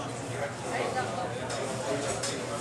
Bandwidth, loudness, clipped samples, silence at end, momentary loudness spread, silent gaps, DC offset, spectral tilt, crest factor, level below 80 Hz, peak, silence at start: 13 kHz; -32 LUFS; under 0.1%; 0 s; 4 LU; none; under 0.1%; -4 dB/octave; 14 dB; -58 dBFS; -18 dBFS; 0 s